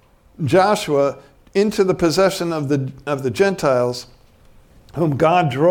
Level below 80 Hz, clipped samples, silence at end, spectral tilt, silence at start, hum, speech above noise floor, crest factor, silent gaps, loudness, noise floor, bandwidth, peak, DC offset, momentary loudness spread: -50 dBFS; under 0.1%; 0 s; -6 dB/octave; 0.4 s; none; 31 dB; 18 dB; none; -18 LUFS; -48 dBFS; 18 kHz; -2 dBFS; under 0.1%; 8 LU